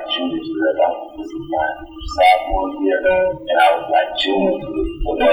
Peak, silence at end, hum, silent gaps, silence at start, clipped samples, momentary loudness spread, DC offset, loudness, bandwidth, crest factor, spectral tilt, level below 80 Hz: -2 dBFS; 0 s; none; none; 0 s; under 0.1%; 11 LU; under 0.1%; -18 LUFS; over 20 kHz; 16 dB; -5 dB/octave; -34 dBFS